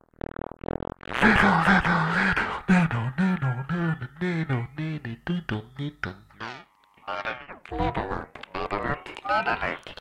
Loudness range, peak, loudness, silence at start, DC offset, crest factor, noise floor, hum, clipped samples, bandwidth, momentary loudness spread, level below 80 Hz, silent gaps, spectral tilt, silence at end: 11 LU; -6 dBFS; -26 LUFS; 1.1 s; under 0.1%; 20 dB; -53 dBFS; none; under 0.1%; 11.5 kHz; 17 LU; -44 dBFS; none; -6.5 dB/octave; 0.05 s